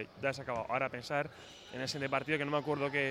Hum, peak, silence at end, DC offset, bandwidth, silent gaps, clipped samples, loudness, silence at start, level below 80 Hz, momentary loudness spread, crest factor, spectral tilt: none; -18 dBFS; 0 s; under 0.1%; 16 kHz; none; under 0.1%; -36 LUFS; 0 s; -68 dBFS; 8 LU; 18 dB; -5 dB/octave